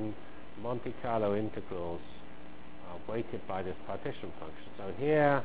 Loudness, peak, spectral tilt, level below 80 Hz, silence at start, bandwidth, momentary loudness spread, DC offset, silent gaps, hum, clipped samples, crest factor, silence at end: -36 LUFS; -14 dBFS; -5.5 dB/octave; -58 dBFS; 0 s; 4 kHz; 19 LU; 1%; none; none; under 0.1%; 22 dB; 0 s